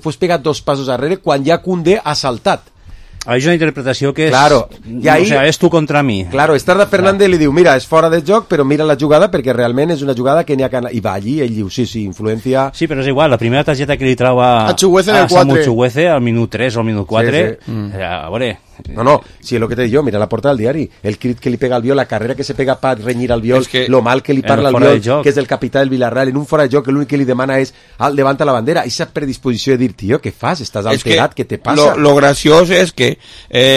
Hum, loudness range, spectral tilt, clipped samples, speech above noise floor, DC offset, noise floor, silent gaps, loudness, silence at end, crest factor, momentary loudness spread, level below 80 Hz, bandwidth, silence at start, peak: none; 5 LU; -5.5 dB/octave; under 0.1%; 19 dB; under 0.1%; -32 dBFS; none; -13 LUFS; 0 s; 12 dB; 9 LU; -40 dBFS; 14.5 kHz; 0.05 s; 0 dBFS